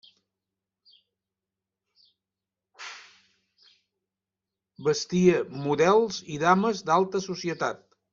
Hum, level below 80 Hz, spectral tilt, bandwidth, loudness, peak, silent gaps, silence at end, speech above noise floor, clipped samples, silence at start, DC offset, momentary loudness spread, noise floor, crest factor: none; -66 dBFS; -5.5 dB/octave; 7.6 kHz; -25 LUFS; -6 dBFS; none; 0.35 s; 65 dB; under 0.1%; 2.8 s; under 0.1%; 20 LU; -89 dBFS; 22 dB